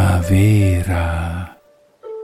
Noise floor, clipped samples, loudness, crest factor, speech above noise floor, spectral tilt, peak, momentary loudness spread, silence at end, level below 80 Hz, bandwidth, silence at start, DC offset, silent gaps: -51 dBFS; under 0.1%; -16 LUFS; 12 dB; 36 dB; -7 dB/octave; -4 dBFS; 18 LU; 0 s; -30 dBFS; 15 kHz; 0 s; under 0.1%; none